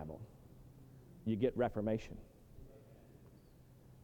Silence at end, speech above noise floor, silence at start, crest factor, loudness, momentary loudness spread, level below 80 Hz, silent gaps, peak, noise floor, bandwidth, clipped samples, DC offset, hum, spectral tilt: 0 s; 25 dB; 0 s; 20 dB; -38 LUFS; 25 LU; -62 dBFS; none; -22 dBFS; -62 dBFS; 19 kHz; under 0.1%; under 0.1%; none; -8 dB/octave